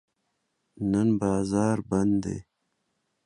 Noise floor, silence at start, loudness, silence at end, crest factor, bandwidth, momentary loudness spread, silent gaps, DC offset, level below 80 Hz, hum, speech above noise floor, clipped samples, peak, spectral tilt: -77 dBFS; 0.8 s; -26 LUFS; 0.85 s; 18 dB; 11 kHz; 9 LU; none; under 0.1%; -54 dBFS; none; 52 dB; under 0.1%; -10 dBFS; -7.5 dB/octave